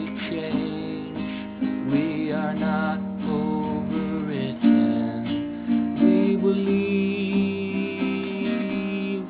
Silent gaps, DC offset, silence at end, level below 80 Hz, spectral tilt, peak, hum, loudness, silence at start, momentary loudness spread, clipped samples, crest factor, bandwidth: none; under 0.1%; 0 s; -54 dBFS; -11.5 dB/octave; -8 dBFS; none; -24 LUFS; 0 s; 9 LU; under 0.1%; 16 dB; 4 kHz